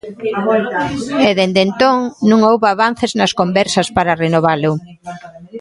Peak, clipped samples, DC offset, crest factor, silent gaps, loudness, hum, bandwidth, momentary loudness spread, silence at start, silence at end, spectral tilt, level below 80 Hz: 0 dBFS; under 0.1%; under 0.1%; 14 dB; none; -14 LUFS; none; 11.5 kHz; 12 LU; 0.05 s; 0 s; -5 dB/octave; -48 dBFS